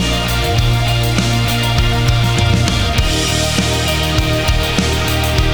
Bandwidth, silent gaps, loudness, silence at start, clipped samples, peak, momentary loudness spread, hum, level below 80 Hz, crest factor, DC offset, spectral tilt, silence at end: over 20 kHz; none; -14 LUFS; 0 s; under 0.1%; 0 dBFS; 1 LU; none; -20 dBFS; 14 dB; 2%; -4.5 dB/octave; 0 s